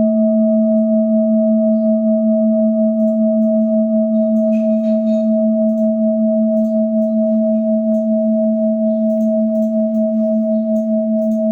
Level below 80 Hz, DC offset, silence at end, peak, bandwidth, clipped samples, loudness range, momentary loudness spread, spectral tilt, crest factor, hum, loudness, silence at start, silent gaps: -66 dBFS; under 0.1%; 0 s; -6 dBFS; 2.6 kHz; under 0.1%; 2 LU; 2 LU; -11.5 dB/octave; 8 dB; none; -15 LUFS; 0 s; none